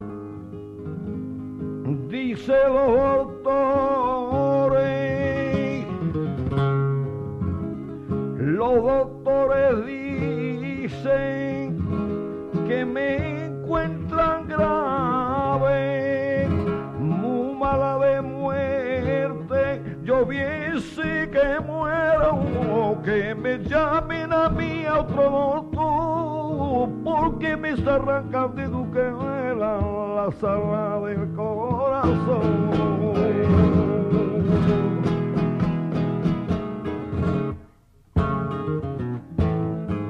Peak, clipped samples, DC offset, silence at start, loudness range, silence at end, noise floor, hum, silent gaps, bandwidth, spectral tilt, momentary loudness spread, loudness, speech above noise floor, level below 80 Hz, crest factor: -6 dBFS; under 0.1%; under 0.1%; 0 s; 4 LU; 0 s; -54 dBFS; none; none; 7.8 kHz; -9 dB/octave; 8 LU; -23 LUFS; 33 dB; -40 dBFS; 16 dB